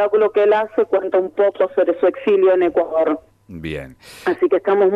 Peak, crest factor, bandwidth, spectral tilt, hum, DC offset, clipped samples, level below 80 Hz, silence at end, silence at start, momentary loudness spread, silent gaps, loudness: -6 dBFS; 12 dB; 10.5 kHz; -7 dB/octave; none; under 0.1%; under 0.1%; -52 dBFS; 0 s; 0 s; 14 LU; none; -17 LUFS